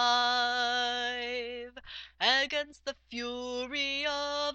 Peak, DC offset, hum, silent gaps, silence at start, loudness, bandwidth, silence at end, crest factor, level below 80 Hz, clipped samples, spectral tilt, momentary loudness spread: -10 dBFS; under 0.1%; none; none; 0 s; -30 LUFS; 8.4 kHz; 0 s; 22 dB; -62 dBFS; under 0.1%; -0.5 dB/octave; 15 LU